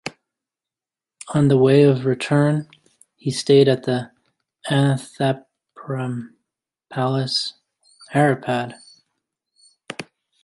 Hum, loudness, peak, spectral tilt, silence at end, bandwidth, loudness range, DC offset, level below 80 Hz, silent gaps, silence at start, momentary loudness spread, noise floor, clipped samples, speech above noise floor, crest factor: none; -20 LUFS; -2 dBFS; -6.5 dB/octave; 0.4 s; 11.5 kHz; 7 LU; under 0.1%; -62 dBFS; none; 0.05 s; 20 LU; -90 dBFS; under 0.1%; 71 dB; 18 dB